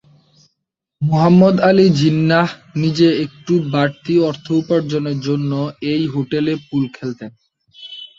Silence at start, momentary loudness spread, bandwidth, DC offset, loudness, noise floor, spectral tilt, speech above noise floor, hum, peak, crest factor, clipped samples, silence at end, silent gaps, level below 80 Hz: 1 s; 12 LU; 7.6 kHz; under 0.1%; -16 LUFS; -76 dBFS; -7.5 dB/octave; 60 dB; none; -2 dBFS; 14 dB; under 0.1%; 0.15 s; none; -56 dBFS